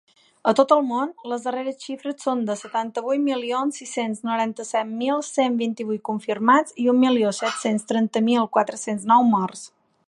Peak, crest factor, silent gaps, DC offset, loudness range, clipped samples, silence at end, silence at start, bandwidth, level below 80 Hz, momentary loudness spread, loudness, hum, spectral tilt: -2 dBFS; 20 dB; none; under 0.1%; 5 LU; under 0.1%; 0.4 s; 0.45 s; 11.5 kHz; -76 dBFS; 10 LU; -22 LUFS; none; -4.5 dB/octave